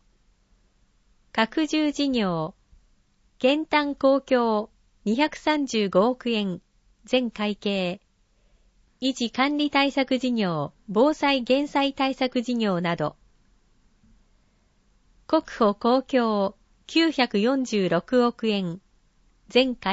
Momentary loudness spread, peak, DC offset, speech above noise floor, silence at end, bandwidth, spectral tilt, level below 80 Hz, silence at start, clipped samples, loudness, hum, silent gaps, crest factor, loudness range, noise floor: 8 LU; -6 dBFS; under 0.1%; 40 dB; 0 s; 8 kHz; -5 dB/octave; -58 dBFS; 1.35 s; under 0.1%; -24 LUFS; none; none; 18 dB; 5 LU; -63 dBFS